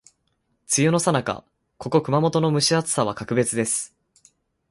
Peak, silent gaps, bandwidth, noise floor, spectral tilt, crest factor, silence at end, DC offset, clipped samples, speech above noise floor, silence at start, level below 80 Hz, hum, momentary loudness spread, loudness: -4 dBFS; none; 12 kHz; -71 dBFS; -4.5 dB/octave; 18 dB; 0.85 s; under 0.1%; under 0.1%; 50 dB; 0.7 s; -60 dBFS; none; 10 LU; -21 LUFS